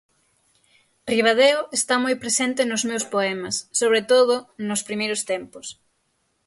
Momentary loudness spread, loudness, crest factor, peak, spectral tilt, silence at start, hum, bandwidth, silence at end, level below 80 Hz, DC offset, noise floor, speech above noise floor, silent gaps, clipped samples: 11 LU; -21 LUFS; 16 dB; -6 dBFS; -2 dB/octave; 1.05 s; none; 12 kHz; 0.75 s; -68 dBFS; under 0.1%; -70 dBFS; 48 dB; none; under 0.1%